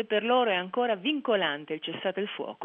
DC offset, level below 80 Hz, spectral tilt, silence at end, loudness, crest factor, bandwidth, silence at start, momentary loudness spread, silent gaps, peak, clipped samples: under 0.1%; -86 dBFS; -7 dB/octave; 0 s; -28 LUFS; 16 dB; 3.9 kHz; 0 s; 9 LU; none; -14 dBFS; under 0.1%